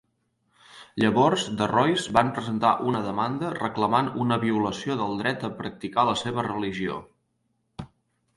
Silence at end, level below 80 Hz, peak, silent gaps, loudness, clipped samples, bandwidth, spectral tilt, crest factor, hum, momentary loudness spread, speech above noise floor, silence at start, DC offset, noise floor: 0.5 s; -58 dBFS; -4 dBFS; none; -25 LUFS; under 0.1%; 11.5 kHz; -5.5 dB/octave; 22 dB; none; 11 LU; 49 dB; 0.75 s; under 0.1%; -73 dBFS